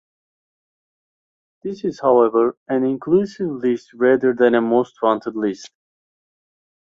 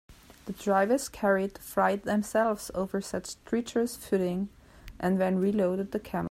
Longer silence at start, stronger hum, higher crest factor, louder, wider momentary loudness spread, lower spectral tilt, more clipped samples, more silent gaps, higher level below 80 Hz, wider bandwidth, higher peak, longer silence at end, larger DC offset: first, 1.65 s vs 0.1 s; neither; about the same, 18 dB vs 16 dB; first, -19 LUFS vs -29 LUFS; about the same, 11 LU vs 9 LU; about the same, -7 dB/octave vs -6 dB/octave; neither; first, 2.57-2.66 s vs none; second, -62 dBFS vs -56 dBFS; second, 7.4 kHz vs 16 kHz; first, -2 dBFS vs -12 dBFS; first, 1.15 s vs 0 s; neither